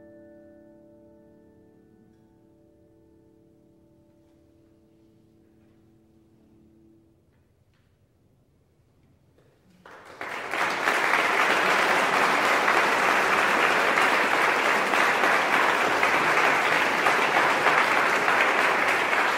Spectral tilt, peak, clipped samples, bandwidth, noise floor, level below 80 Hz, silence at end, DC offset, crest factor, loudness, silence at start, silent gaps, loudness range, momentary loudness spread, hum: -2 dB/octave; -6 dBFS; under 0.1%; 16 kHz; -64 dBFS; -68 dBFS; 0 s; under 0.1%; 20 dB; -21 LUFS; 9.85 s; none; 8 LU; 2 LU; none